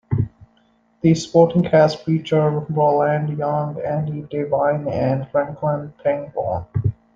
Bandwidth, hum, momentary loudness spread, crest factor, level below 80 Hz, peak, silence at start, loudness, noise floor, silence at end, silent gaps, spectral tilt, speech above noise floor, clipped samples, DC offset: 7.8 kHz; none; 9 LU; 18 dB; -48 dBFS; -2 dBFS; 0.1 s; -20 LUFS; -59 dBFS; 0.25 s; none; -7.5 dB/octave; 40 dB; under 0.1%; under 0.1%